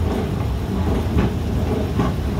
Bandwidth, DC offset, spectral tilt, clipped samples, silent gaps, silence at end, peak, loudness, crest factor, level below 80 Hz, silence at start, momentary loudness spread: 16 kHz; under 0.1%; -7.5 dB/octave; under 0.1%; none; 0 s; -6 dBFS; -22 LUFS; 14 dB; -26 dBFS; 0 s; 3 LU